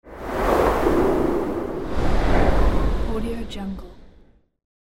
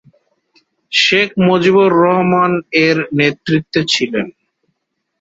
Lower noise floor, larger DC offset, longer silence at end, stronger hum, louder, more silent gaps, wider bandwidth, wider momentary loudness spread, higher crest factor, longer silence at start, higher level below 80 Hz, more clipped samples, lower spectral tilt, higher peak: second, -53 dBFS vs -71 dBFS; neither; second, 0.2 s vs 0.9 s; neither; second, -23 LUFS vs -13 LUFS; neither; first, 16.5 kHz vs 8 kHz; first, 11 LU vs 7 LU; about the same, 16 dB vs 14 dB; second, 0 s vs 0.9 s; first, -26 dBFS vs -54 dBFS; neither; first, -7 dB/octave vs -5 dB/octave; second, -4 dBFS vs 0 dBFS